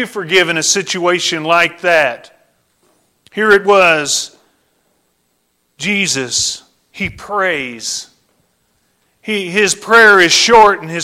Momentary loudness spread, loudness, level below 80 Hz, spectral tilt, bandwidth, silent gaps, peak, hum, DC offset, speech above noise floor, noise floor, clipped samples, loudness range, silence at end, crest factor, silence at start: 16 LU; -12 LUFS; -50 dBFS; -2 dB/octave; 16.5 kHz; none; 0 dBFS; none; under 0.1%; 51 dB; -63 dBFS; under 0.1%; 8 LU; 0 s; 14 dB; 0 s